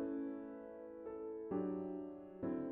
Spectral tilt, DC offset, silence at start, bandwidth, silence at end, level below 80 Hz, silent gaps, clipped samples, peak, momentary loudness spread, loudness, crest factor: -9.5 dB/octave; under 0.1%; 0 s; 3.6 kHz; 0 s; -74 dBFS; none; under 0.1%; -30 dBFS; 9 LU; -46 LUFS; 14 dB